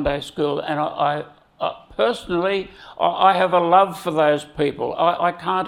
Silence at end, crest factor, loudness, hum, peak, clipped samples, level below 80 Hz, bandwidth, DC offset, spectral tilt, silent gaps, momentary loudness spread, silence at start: 0 s; 18 dB; -20 LUFS; none; -2 dBFS; under 0.1%; -48 dBFS; 16 kHz; under 0.1%; -5.5 dB/octave; none; 12 LU; 0 s